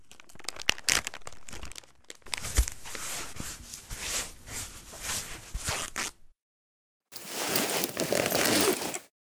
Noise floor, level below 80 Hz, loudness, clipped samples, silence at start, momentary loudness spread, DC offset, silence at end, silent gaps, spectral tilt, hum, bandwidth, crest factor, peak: under -90 dBFS; -42 dBFS; -30 LUFS; under 0.1%; 0.1 s; 18 LU; under 0.1%; 0.1 s; 6.42-7.00 s; -2 dB/octave; none; over 20 kHz; 30 dB; -2 dBFS